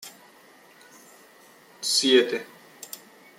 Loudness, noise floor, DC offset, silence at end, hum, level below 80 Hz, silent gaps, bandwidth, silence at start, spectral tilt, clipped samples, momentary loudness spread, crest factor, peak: -22 LUFS; -53 dBFS; under 0.1%; 0.4 s; none; -80 dBFS; none; 16.5 kHz; 0 s; -1 dB/octave; under 0.1%; 26 LU; 22 dB; -6 dBFS